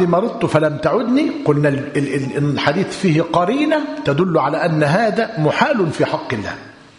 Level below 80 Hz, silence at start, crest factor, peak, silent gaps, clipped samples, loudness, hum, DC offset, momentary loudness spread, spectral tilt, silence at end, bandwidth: -52 dBFS; 0 s; 16 dB; 0 dBFS; none; under 0.1%; -17 LUFS; none; under 0.1%; 5 LU; -6.5 dB/octave; 0.25 s; 11 kHz